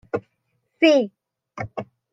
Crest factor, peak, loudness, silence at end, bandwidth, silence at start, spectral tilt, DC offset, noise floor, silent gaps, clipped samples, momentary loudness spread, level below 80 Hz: 20 dB; -4 dBFS; -21 LUFS; 0.3 s; 7.6 kHz; 0.15 s; -5.5 dB/octave; under 0.1%; -72 dBFS; none; under 0.1%; 18 LU; -62 dBFS